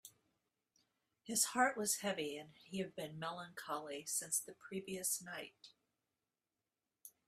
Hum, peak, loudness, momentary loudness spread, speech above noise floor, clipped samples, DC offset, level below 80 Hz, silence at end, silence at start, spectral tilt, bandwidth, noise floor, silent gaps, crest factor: none; -20 dBFS; -40 LUFS; 17 LU; over 48 dB; under 0.1%; under 0.1%; -84 dBFS; 0.2 s; 0.05 s; -2 dB/octave; 16 kHz; under -90 dBFS; none; 24 dB